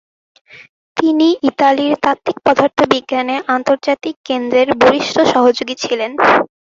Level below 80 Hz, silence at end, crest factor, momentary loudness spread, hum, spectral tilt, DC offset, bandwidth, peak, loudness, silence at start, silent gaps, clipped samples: -54 dBFS; 0.2 s; 14 dB; 7 LU; none; -4 dB/octave; under 0.1%; 7.6 kHz; 0 dBFS; -14 LUFS; 0.55 s; 0.69-0.95 s, 4.16-4.24 s; under 0.1%